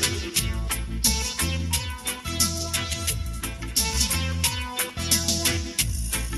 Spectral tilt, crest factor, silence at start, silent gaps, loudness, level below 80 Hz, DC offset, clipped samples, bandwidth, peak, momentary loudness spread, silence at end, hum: -2.5 dB/octave; 20 dB; 0 s; none; -24 LUFS; -32 dBFS; under 0.1%; under 0.1%; 13 kHz; -6 dBFS; 7 LU; 0 s; none